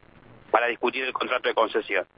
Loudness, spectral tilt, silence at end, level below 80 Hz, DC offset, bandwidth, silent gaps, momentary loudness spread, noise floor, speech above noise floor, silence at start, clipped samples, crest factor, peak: -25 LUFS; -7 dB/octave; 0.15 s; -64 dBFS; under 0.1%; 5.6 kHz; none; 3 LU; -51 dBFS; 26 dB; 0.5 s; under 0.1%; 22 dB; -6 dBFS